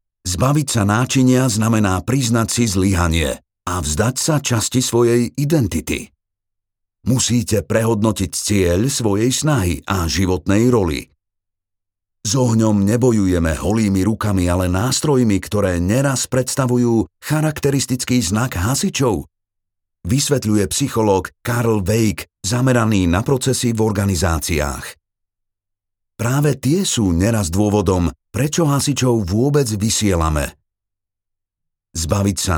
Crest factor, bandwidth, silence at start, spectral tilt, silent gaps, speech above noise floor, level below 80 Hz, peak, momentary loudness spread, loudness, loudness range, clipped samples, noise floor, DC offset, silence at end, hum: 16 dB; over 20 kHz; 0.25 s; -5 dB/octave; none; 64 dB; -36 dBFS; -2 dBFS; 6 LU; -17 LUFS; 3 LU; under 0.1%; -81 dBFS; under 0.1%; 0 s; none